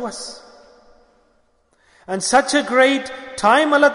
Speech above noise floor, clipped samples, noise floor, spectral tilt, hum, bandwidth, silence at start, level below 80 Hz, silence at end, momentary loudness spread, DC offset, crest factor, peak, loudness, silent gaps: 44 dB; under 0.1%; -60 dBFS; -2.5 dB/octave; none; 11 kHz; 0 s; -58 dBFS; 0 s; 16 LU; under 0.1%; 16 dB; -2 dBFS; -17 LUFS; none